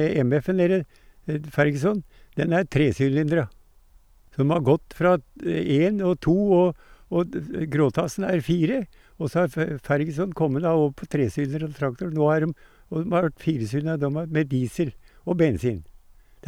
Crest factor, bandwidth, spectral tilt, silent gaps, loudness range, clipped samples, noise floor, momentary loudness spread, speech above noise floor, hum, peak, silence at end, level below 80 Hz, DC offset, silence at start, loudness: 16 dB; 14.5 kHz; -8 dB/octave; none; 3 LU; under 0.1%; -54 dBFS; 9 LU; 31 dB; none; -8 dBFS; 0.65 s; -50 dBFS; under 0.1%; 0 s; -24 LUFS